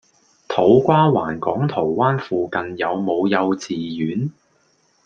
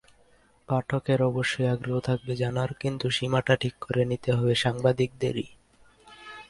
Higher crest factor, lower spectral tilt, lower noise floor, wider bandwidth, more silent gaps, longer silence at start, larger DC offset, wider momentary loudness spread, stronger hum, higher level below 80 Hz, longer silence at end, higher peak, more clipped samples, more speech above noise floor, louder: about the same, 18 dB vs 18 dB; first, -7.5 dB/octave vs -6 dB/octave; about the same, -61 dBFS vs -61 dBFS; second, 7.6 kHz vs 11.5 kHz; neither; second, 0.5 s vs 0.7 s; neither; first, 10 LU vs 6 LU; neither; about the same, -56 dBFS vs -56 dBFS; first, 0.75 s vs 0.05 s; first, -2 dBFS vs -8 dBFS; neither; first, 43 dB vs 35 dB; first, -19 LUFS vs -27 LUFS